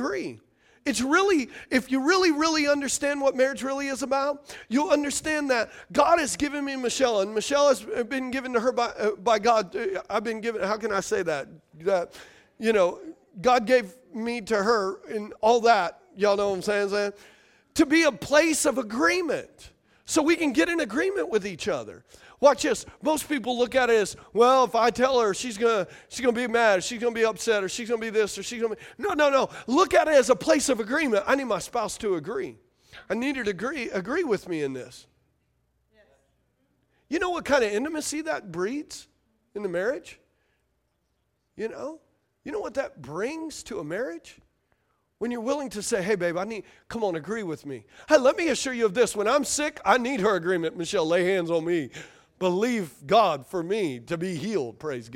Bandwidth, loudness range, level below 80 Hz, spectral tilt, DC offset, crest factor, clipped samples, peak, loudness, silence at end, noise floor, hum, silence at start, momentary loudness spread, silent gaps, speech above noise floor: 16.5 kHz; 10 LU; -60 dBFS; -3.5 dB/octave; under 0.1%; 20 dB; under 0.1%; -4 dBFS; -25 LUFS; 0 s; -74 dBFS; none; 0 s; 12 LU; none; 49 dB